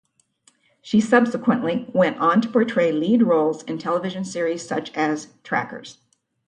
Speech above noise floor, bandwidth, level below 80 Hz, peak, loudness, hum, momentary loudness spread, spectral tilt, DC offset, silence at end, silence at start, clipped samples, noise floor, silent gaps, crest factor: 40 dB; 10 kHz; -68 dBFS; -2 dBFS; -21 LUFS; none; 10 LU; -6 dB/octave; under 0.1%; 0.55 s; 0.85 s; under 0.1%; -61 dBFS; none; 20 dB